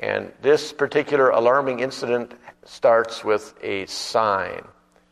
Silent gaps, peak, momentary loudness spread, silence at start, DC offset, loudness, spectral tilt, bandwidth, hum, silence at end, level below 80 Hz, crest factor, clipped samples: none; -4 dBFS; 10 LU; 0 s; under 0.1%; -21 LUFS; -4 dB/octave; 13 kHz; none; 0.5 s; -64 dBFS; 18 dB; under 0.1%